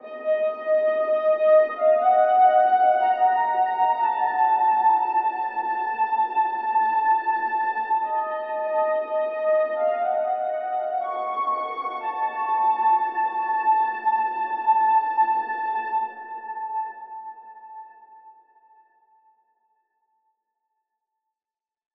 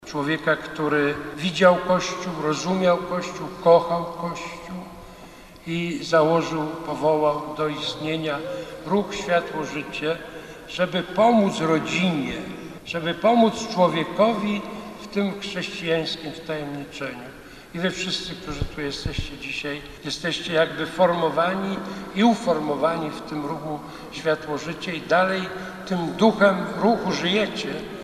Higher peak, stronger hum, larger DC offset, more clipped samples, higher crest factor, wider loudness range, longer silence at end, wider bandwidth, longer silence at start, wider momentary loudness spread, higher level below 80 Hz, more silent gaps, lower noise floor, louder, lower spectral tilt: second, -8 dBFS vs -2 dBFS; neither; neither; neither; second, 14 dB vs 22 dB; about the same, 9 LU vs 7 LU; first, 3.65 s vs 0 s; second, 4.7 kHz vs 13 kHz; about the same, 0.05 s vs 0 s; second, 10 LU vs 14 LU; second, -86 dBFS vs -48 dBFS; neither; first, under -90 dBFS vs -44 dBFS; about the same, -22 LUFS vs -23 LUFS; about the same, -5 dB/octave vs -5 dB/octave